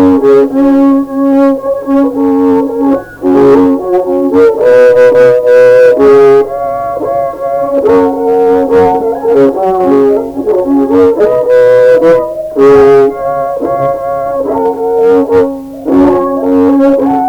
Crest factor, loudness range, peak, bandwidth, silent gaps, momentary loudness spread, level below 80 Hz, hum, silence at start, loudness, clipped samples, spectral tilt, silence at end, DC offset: 6 dB; 4 LU; 0 dBFS; 10.5 kHz; none; 9 LU; -40 dBFS; none; 0 s; -7 LUFS; 0.4%; -7.5 dB/octave; 0 s; under 0.1%